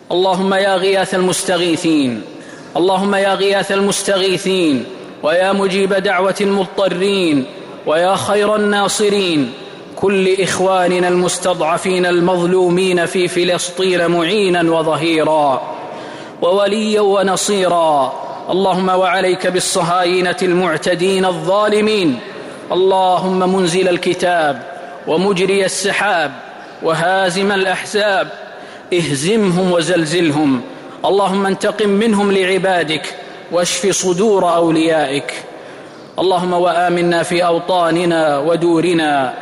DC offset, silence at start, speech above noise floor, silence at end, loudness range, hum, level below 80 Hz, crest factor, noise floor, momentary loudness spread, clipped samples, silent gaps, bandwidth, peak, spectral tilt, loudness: under 0.1%; 0.1 s; 20 dB; 0 s; 2 LU; none; -56 dBFS; 10 dB; -34 dBFS; 9 LU; under 0.1%; none; 15.5 kHz; -6 dBFS; -4.5 dB/octave; -14 LUFS